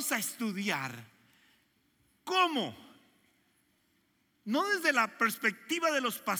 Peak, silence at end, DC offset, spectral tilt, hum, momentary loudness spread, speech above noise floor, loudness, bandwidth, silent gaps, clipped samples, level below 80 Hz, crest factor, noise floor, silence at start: -12 dBFS; 0 s; under 0.1%; -2.5 dB/octave; none; 13 LU; 41 dB; -31 LUFS; 17 kHz; none; under 0.1%; -84 dBFS; 22 dB; -73 dBFS; 0 s